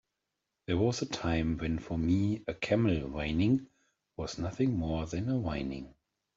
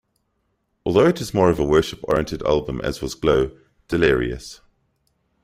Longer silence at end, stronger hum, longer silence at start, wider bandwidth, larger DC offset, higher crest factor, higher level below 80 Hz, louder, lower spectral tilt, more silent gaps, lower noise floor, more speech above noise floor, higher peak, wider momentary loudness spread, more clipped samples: second, 0.45 s vs 0.9 s; neither; second, 0.7 s vs 0.85 s; second, 7.8 kHz vs 15.5 kHz; neither; about the same, 16 dB vs 18 dB; second, -50 dBFS vs -40 dBFS; second, -32 LUFS vs -20 LUFS; about the same, -6.5 dB/octave vs -6 dB/octave; neither; first, -86 dBFS vs -71 dBFS; first, 55 dB vs 51 dB; second, -16 dBFS vs -2 dBFS; about the same, 11 LU vs 10 LU; neither